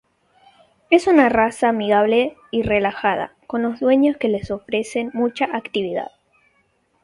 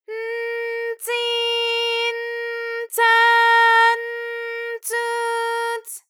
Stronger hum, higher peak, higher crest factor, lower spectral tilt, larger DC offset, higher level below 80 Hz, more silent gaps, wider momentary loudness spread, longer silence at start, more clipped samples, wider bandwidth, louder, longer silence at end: neither; first, 0 dBFS vs -6 dBFS; first, 20 dB vs 14 dB; first, -5.5 dB/octave vs 5 dB/octave; neither; first, -50 dBFS vs under -90 dBFS; neither; second, 10 LU vs 14 LU; first, 0.9 s vs 0.1 s; neither; second, 11.5 kHz vs 19.5 kHz; about the same, -19 LUFS vs -19 LUFS; first, 1 s vs 0.1 s